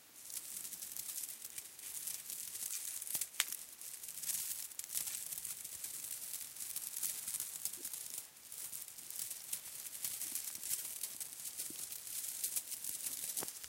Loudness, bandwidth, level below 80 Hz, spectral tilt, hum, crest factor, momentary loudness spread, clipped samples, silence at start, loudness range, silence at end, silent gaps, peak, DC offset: -41 LUFS; 17 kHz; -82 dBFS; 1.5 dB/octave; none; 36 dB; 7 LU; under 0.1%; 0 s; 2 LU; 0 s; none; -8 dBFS; under 0.1%